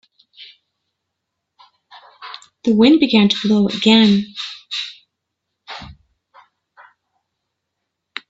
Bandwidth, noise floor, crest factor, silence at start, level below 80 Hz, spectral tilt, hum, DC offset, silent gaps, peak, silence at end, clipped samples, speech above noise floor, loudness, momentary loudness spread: 7.8 kHz; -78 dBFS; 20 dB; 0.4 s; -58 dBFS; -5.5 dB/octave; none; under 0.1%; none; 0 dBFS; 2.4 s; under 0.1%; 64 dB; -15 LUFS; 23 LU